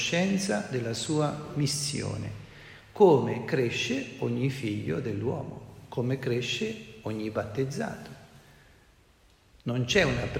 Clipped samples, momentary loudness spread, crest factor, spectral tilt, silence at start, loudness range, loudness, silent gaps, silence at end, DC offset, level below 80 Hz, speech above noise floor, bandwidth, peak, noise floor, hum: under 0.1%; 15 LU; 22 dB; -5 dB/octave; 0 s; 7 LU; -29 LUFS; none; 0 s; under 0.1%; -56 dBFS; 33 dB; 16 kHz; -8 dBFS; -61 dBFS; none